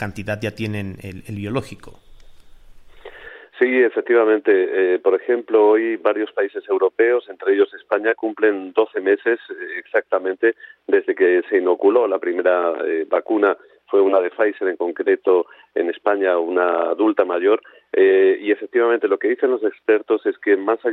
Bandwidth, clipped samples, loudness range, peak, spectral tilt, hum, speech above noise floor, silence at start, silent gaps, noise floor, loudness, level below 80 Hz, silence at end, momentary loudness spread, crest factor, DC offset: 6.2 kHz; under 0.1%; 3 LU; -4 dBFS; -7.5 dB/octave; none; 24 dB; 0 s; none; -42 dBFS; -19 LUFS; -56 dBFS; 0 s; 10 LU; 16 dB; under 0.1%